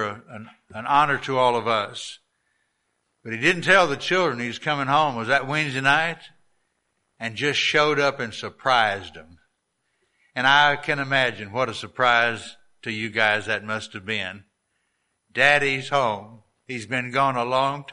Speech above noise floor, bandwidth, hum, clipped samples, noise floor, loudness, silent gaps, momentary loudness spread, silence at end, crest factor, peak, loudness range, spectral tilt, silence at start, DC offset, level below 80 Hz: 51 dB; 11.5 kHz; none; under 0.1%; -74 dBFS; -21 LUFS; none; 17 LU; 0 s; 20 dB; -2 dBFS; 3 LU; -4 dB/octave; 0 s; under 0.1%; -64 dBFS